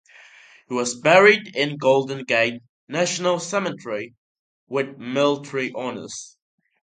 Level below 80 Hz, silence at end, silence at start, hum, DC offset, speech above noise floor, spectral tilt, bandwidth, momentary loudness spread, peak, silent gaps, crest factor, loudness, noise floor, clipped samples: -72 dBFS; 0.55 s; 0.7 s; none; under 0.1%; 28 dB; -3.5 dB/octave; 9.4 kHz; 16 LU; 0 dBFS; 2.69-2.87 s, 4.18-4.67 s; 22 dB; -21 LUFS; -49 dBFS; under 0.1%